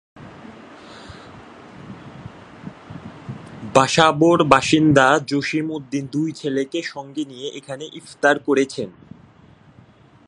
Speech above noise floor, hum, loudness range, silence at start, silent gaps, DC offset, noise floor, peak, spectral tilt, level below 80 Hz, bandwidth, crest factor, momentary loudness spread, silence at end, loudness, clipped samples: 31 dB; none; 19 LU; 0.15 s; none; under 0.1%; -49 dBFS; 0 dBFS; -5 dB/octave; -54 dBFS; 11 kHz; 22 dB; 26 LU; 1.35 s; -18 LUFS; under 0.1%